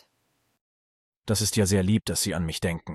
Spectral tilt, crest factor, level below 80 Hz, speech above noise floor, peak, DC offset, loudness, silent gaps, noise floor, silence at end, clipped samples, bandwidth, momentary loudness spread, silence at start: -4.5 dB/octave; 16 dB; -52 dBFS; 48 dB; -10 dBFS; under 0.1%; -25 LUFS; none; -73 dBFS; 0 s; under 0.1%; 13 kHz; 7 LU; 1.25 s